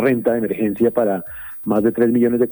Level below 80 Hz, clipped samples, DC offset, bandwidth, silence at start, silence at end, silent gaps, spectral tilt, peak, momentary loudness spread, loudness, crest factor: -52 dBFS; under 0.1%; under 0.1%; over 20 kHz; 0 s; 0 s; none; -10 dB/octave; -2 dBFS; 8 LU; -18 LUFS; 14 dB